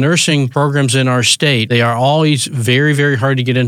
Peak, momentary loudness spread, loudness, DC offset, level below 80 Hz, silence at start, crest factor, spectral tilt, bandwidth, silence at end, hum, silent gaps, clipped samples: 0 dBFS; 3 LU; -12 LUFS; under 0.1%; -62 dBFS; 0 s; 12 dB; -4.5 dB/octave; 15.5 kHz; 0 s; none; none; under 0.1%